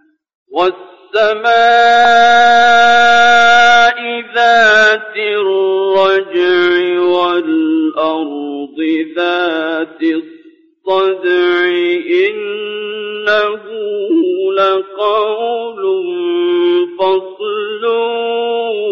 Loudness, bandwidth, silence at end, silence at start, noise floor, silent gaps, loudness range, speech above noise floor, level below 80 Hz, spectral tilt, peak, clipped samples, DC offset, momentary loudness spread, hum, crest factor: -12 LUFS; 7.6 kHz; 0 s; 0.5 s; -44 dBFS; none; 8 LU; 33 dB; -54 dBFS; 0.5 dB/octave; -2 dBFS; under 0.1%; under 0.1%; 12 LU; none; 10 dB